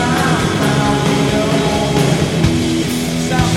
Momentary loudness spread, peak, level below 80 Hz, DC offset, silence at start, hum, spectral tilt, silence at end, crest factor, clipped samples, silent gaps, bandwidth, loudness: 2 LU; 0 dBFS; -32 dBFS; under 0.1%; 0 s; none; -5 dB/octave; 0 s; 14 dB; under 0.1%; none; 16.5 kHz; -15 LUFS